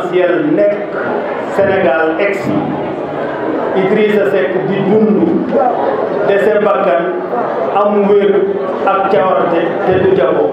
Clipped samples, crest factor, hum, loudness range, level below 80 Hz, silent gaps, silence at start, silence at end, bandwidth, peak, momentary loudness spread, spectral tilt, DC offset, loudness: under 0.1%; 12 dB; none; 2 LU; -56 dBFS; none; 0 s; 0 s; 8.4 kHz; 0 dBFS; 6 LU; -8 dB/octave; under 0.1%; -13 LUFS